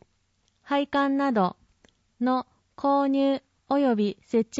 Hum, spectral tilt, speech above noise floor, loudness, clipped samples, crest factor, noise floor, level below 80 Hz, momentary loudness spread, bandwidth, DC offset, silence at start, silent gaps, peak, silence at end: none; -6 dB/octave; 46 dB; -26 LUFS; under 0.1%; 14 dB; -70 dBFS; -66 dBFS; 7 LU; 7.8 kHz; under 0.1%; 0.65 s; none; -12 dBFS; 0 s